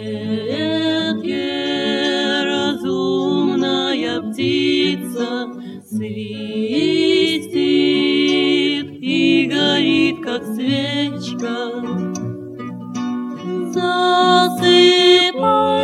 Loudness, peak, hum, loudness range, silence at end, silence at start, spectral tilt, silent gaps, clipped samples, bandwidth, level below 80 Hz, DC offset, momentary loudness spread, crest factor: -17 LUFS; 0 dBFS; none; 6 LU; 0 s; 0 s; -4.5 dB/octave; none; under 0.1%; 13.5 kHz; -64 dBFS; under 0.1%; 13 LU; 16 dB